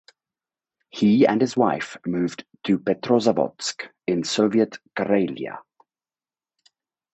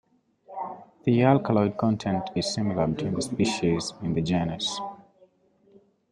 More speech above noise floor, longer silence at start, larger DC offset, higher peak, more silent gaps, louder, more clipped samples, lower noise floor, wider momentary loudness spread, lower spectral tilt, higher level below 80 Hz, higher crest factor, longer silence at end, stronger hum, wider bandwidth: first, over 68 dB vs 37 dB; first, 0.95 s vs 0.5 s; neither; about the same, -4 dBFS vs -6 dBFS; neither; first, -22 LUFS vs -26 LUFS; neither; first, under -90 dBFS vs -62 dBFS; about the same, 13 LU vs 15 LU; about the same, -5.5 dB/octave vs -6 dB/octave; second, -66 dBFS vs -56 dBFS; about the same, 20 dB vs 22 dB; first, 1.55 s vs 1.1 s; neither; second, 8.4 kHz vs 11.5 kHz